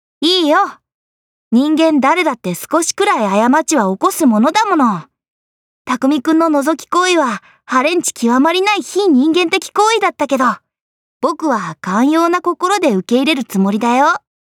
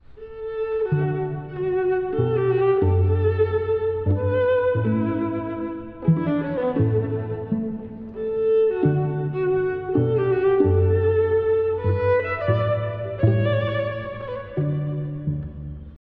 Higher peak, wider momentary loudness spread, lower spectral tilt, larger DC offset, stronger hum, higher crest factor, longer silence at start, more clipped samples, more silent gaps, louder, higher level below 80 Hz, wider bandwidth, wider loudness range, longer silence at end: first, -2 dBFS vs -6 dBFS; second, 6 LU vs 11 LU; second, -4 dB/octave vs -11.5 dB/octave; neither; neither; about the same, 12 dB vs 16 dB; about the same, 0.2 s vs 0.1 s; neither; first, 0.94-1.51 s, 5.28-5.85 s, 10.81-11.20 s vs none; first, -14 LUFS vs -22 LUFS; second, -70 dBFS vs -46 dBFS; first, 17.5 kHz vs 4.7 kHz; about the same, 2 LU vs 4 LU; first, 0.3 s vs 0.1 s